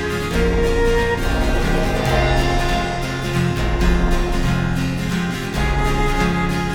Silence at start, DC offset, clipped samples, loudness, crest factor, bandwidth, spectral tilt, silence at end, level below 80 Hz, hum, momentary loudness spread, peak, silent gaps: 0 s; under 0.1%; under 0.1%; -19 LUFS; 14 dB; 17.5 kHz; -5.5 dB/octave; 0 s; -22 dBFS; none; 4 LU; -4 dBFS; none